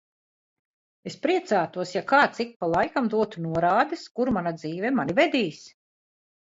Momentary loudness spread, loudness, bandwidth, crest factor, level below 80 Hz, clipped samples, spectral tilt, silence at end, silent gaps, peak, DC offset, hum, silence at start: 9 LU; -25 LUFS; 8 kHz; 20 dB; -60 dBFS; under 0.1%; -5.5 dB/octave; 0.8 s; 2.56-2.60 s; -6 dBFS; under 0.1%; none; 1.05 s